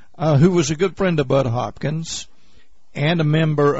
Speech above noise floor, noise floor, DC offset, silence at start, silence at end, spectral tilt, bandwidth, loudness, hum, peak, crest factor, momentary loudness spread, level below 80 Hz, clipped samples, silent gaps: 38 dB; -56 dBFS; 1%; 0.2 s; 0 s; -6.5 dB/octave; 8 kHz; -19 LUFS; none; -4 dBFS; 14 dB; 11 LU; -46 dBFS; under 0.1%; none